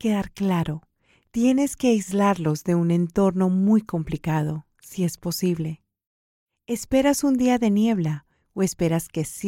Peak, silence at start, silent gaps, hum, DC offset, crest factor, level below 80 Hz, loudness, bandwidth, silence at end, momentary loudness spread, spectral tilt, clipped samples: -6 dBFS; 0 s; 6.06-6.47 s; none; under 0.1%; 16 dB; -50 dBFS; -23 LUFS; 16.5 kHz; 0 s; 11 LU; -6.5 dB/octave; under 0.1%